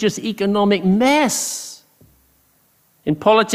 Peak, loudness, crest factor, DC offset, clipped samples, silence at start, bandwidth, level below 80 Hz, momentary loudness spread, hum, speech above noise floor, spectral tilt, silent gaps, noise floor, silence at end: -2 dBFS; -17 LUFS; 16 dB; under 0.1%; under 0.1%; 0 s; 15.5 kHz; -56 dBFS; 13 LU; none; 42 dB; -4.5 dB/octave; none; -59 dBFS; 0 s